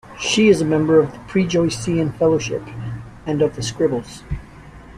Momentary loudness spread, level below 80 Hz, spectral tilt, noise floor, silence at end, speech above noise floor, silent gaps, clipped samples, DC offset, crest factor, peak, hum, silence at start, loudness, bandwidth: 17 LU; -42 dBFS; -5.5 dB/octave; -40 dBFS; 0 s; 22 dB; none; under 0.1%; under 0.1%; 18 dB; -2 dBFS; none; 0.05 s; -18 LUFS; 12.5 kHz